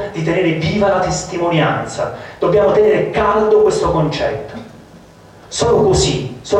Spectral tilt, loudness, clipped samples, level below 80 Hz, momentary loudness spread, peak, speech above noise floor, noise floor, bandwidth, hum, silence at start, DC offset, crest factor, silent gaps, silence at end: -5 dB/octave; -15 LUFS; under 0.1%; -36 dBFS; 11 LU; -2 dBFS; 27 dB; -41 dBFS; 10.5 kHz; none; 0 s; under 0.1%; 12 dB; none; 0 s